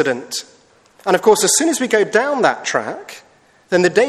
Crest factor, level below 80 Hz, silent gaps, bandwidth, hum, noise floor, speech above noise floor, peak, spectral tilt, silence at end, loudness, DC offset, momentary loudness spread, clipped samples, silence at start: 16 dB; -62 dBFS; none; 14.5 kHz; none; -50 dBFS; 34 dB; 0 dBFS; -2.5 dB/octave; 0 s; -16 LUFS; under 0.1%; 14 LU; under 0.1%; 0 s